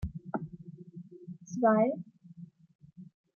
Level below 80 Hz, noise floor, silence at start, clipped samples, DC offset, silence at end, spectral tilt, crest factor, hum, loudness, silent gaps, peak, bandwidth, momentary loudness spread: -56 dBFS; -52 dBFS; 0 s; under 0.1%; under 0.1%; 0.3 s; -8.5 dB/octave; 20 dB; none; -31 LUFS; 2.75-2.79 s; -14 dBFS; 7 kHz; 27 LU